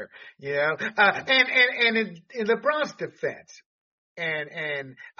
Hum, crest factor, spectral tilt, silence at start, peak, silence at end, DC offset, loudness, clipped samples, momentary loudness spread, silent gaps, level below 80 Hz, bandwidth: none; 20 dB; -0.5 dB/octave; 0 s; -6 dBFS; 0.1 s; under 0.1%; -24 LUFS; under 0.1%; 14 LU; 3.66-4.16 s; -76 dBFS; 7.2 kHz